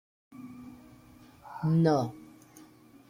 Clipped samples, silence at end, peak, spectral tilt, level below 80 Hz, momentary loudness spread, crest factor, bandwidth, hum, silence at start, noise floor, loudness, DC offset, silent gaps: under 0.1%; 0.9 s; -14 dBFS; -8.5 dB/octave; -66 dBFS; 25 LU; 18 dB; 11 kHz; none; 0.35 s; -55 dBFS; -28 LUFS; under 0.1%; none